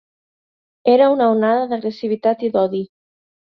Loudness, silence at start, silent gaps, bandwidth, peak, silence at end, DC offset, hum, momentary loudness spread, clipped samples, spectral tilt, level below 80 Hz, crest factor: -17 LUFS; 0.85 s; none; 6 kHz; -2 dBFS; 0.65 s; under 0.1%; none; 10 LU; under 0.1%; -8.5 dB/octave; -66 dBFS; 16 dB